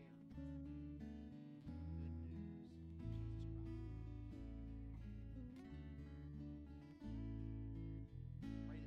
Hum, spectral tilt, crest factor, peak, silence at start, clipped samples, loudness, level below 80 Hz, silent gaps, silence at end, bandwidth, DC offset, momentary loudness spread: none; -9.5 dB/octave; 12 dB; -38 dBFS; 0 s; under 0.1%; -53 LUFS; -56 dBFS; none; 0 s; 6.8 kHz; under 0.1%; 6 LU